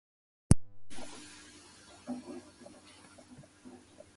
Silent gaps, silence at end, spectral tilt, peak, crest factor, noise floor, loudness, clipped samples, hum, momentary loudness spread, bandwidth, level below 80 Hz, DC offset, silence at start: none; 0.4 s; -6 dB/octave; -6 dBFS; 32 dB; -57 dBFS; -36 LUFS; under 0.1%; none; 25 LU; 11.5 kHz; -46 dBFS; under 0.1%; 0.5 s